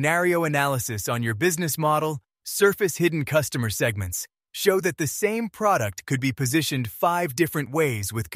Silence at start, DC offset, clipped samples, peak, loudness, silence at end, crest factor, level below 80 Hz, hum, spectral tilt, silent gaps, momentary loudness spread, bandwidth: 0 s; under 0.1%; under 0.1%; -6 dBFS; -24 LUFS; 0 s; 18 dB; -56 dBFS; none; -4.5 dB/octave; none; 6 LU; 16 kHz